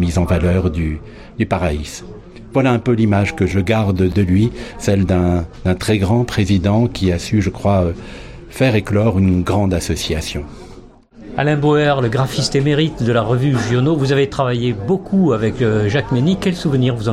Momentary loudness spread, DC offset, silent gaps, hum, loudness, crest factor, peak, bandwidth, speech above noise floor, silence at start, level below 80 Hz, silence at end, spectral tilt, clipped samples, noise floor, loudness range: 8 LU; under 0.1%; none; none; -16 LUFS; 14 dB; -2 dBFS; 14 kHz; 24 dB; 0 s; -34 dBFS; 0 s; -6.5 dB/octave; under 0.1%; -40 dBFS; 2 LU